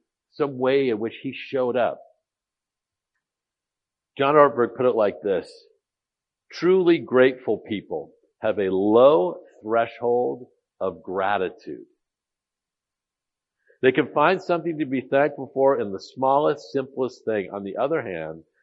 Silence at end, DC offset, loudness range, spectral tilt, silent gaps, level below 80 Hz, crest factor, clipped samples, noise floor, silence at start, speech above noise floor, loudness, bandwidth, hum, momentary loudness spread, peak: 0.2 s; under 0.1%; 7 LU; -7 dB/octave; none; -72 dBFS; 22 dB; under 0.1%; -88 dBFS; 0.4 s; 66 dB; -22 LUFS; 7.4 kHz; none; 14 LU; -2 dBFS